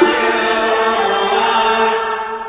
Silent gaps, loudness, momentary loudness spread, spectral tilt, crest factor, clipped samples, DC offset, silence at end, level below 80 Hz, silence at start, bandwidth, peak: none; -14 LUFS; 3 LU; -7 dB/octave; 14 dB; under 0.1%; under 0.1%; 0 s; -50 dBFS; 0 s; 4 kHz; 0 dBFS